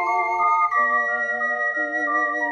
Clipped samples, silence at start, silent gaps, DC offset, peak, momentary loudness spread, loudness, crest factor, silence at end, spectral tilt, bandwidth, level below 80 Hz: under 0.1%; 0 s; none; under 0.1%; -10 dBFS; 4 LU; -20 LUFS; 12 dB; 0 s; -3.5 dB/octave; 10 kHz; -66 dBFS